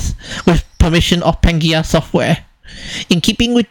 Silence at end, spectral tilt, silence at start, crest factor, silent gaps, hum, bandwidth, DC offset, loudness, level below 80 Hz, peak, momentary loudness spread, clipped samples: 0.05 s; -5 dB/octave; 0 s; 14 dB; none; none; 18 kHz; under 0.1%; -14 LUFS; -22 dBFS; 0 dBFS; 10 LU; 0.2%